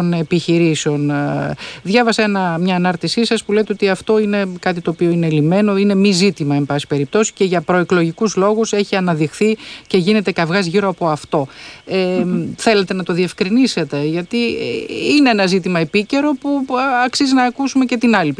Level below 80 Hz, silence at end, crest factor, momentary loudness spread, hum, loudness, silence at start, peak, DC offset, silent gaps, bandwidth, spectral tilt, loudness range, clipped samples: -54 dBFS; 0.05 s; 14 dB; 6 LU; none; -16 LUFS; 0 s; -2 dBFS; under 0.1%; none; 10.5 kHz; -5.5 dB/octave; 2 LU; under 0.1%